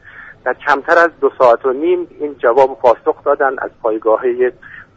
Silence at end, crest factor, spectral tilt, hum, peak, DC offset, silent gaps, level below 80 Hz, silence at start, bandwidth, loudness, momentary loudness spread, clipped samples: 0.15 s; 14 dB; -5.5 dB/octave; none; 0 dBFS; under 0.1%; none; -54 dBFS; 0.15 s; 7.8 kHz; -14 LUFS; 8 LU; under 0.1%